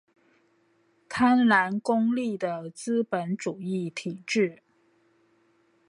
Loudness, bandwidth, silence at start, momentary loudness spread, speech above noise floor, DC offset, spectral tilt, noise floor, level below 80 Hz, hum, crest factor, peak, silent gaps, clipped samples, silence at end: -26 LUFS; 11 kHz; 1.1 s; 12 LU; 41 dB; under 0.1%; -5.5 dB/octave; -67 dBFS; -70 dBFS; none; 20 dB; -8 dBFS; none; under 0.1%; 1.35 s